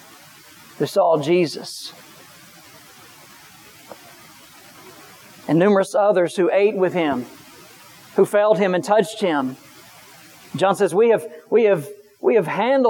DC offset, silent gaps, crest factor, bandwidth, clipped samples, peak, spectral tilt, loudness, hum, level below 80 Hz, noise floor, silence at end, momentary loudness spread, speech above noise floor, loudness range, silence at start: under 0.1%; none; 18 dB; 19 kHz; under 0.1%; -2 dBFS; -5.5 dB/octave; -19 LUFS; none; -72 dBFS; -46 dBFS; 0 s; 17 LU; 28 dB; 7 LU; 0.8 s